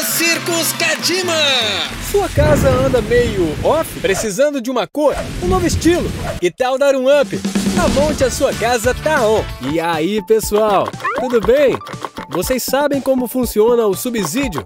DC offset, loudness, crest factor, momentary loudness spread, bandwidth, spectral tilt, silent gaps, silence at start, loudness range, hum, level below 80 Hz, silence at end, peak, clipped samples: under 0.1%; -15 LUFS; 14 dB; 6 LU; 18.5 kHz; -4 dB/octave; none; 0 s; 2 LU; none; -32 dBFS; 0 s; -2 dBFS; under 0.1%